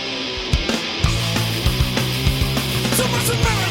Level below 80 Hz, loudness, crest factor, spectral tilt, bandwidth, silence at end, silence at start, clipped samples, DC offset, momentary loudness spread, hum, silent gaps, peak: -28 dBFS; -19 LUFS; 18 dB; -4 dB/octave; 16.5 kHz; 0 s; 0 s; under 0.1%; under 0.1%; 3 LU; none; none; -2 dBFS